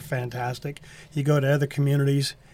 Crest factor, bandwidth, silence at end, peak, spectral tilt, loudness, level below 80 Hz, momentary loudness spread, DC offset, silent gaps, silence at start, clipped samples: 14 dB; 15.5 kHz; 0.2 s; -12 dBFS; -6.5 dB/octave; -25 LUFS; -58 dBFS; 13 LU; under 0.1%; none; 0 s; under 0.1%